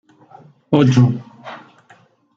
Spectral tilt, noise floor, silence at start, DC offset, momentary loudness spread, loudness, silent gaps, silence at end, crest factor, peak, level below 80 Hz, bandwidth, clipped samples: -8 dB/octave; -51 dBFS; 0.7 s; under 0.1%; 23 LU; -15 LUFS; none; 0.8 s; 18 dB; -2 dBFS; -54 dBFS; 7.4 kHz; under 0.1%